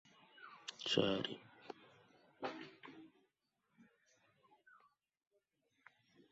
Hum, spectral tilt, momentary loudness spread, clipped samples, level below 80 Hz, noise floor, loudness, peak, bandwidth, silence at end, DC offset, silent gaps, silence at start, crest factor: none; -3 dB/octave; 23 LU; under 0.1%; -82 dBFS; -85 dBFS; -41 LUFS; -20 dBFS; 7.6 kHz; 2.5 s; under 0.1%; none; 0.35 s; 28 dB